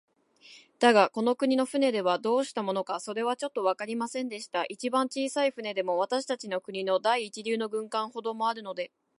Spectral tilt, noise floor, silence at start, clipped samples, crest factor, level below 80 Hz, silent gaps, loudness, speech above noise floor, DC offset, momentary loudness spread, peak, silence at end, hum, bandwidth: -3.5 dB/octave; -56 dBFS; 0.45 s; under 0.1%; 22 dB; -84 dBFS; none; -29 LUFS; 28 dB; under 0.1%; 8 LU; -6 dBFS; 0.3 s; none; 11.5 kHz